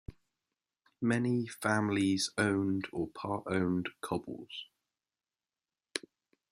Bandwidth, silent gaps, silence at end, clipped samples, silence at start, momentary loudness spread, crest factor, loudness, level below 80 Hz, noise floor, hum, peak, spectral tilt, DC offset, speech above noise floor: 15 kHz; none; 0.5 s; under 0.1%; 0.1 s; 13 LU; 24 dB; -33 LUFS; -64 dBFS; under -90 dBFS; none; -12 dBFS; -5 dB/octave; under 0.1%; over 57 dB